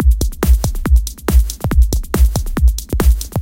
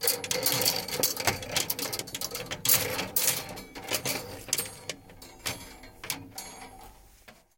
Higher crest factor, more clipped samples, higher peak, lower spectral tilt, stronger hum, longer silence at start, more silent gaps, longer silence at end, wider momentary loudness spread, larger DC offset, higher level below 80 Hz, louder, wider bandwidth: second, 12 dB vs 26 dB; neither; first, 0 dBFS vs -6 dBFS; first, -6 dB/octave vs -1 dB/octave; neither; about the same, 0 s vs 0 s; neither; second, 0 s vs 0.25 s; second, 1 LU vs 18 LU; neither; first, -14 dBFS vs -58 dBFS; first, -16 LUFS vs -28 LUFS; about the same, 17 kHz vs 17 kHz